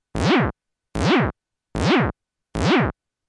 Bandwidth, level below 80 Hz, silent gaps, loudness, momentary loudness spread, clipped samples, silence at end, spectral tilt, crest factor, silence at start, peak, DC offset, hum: 11.5 kHz; -38 dBFS; none; -21 LUFS; 11 LU; under 0.1%; 0.35 s; -6 dB/octave; 16 dB; 0.15 s; -6 dBFS; under 0.1%; none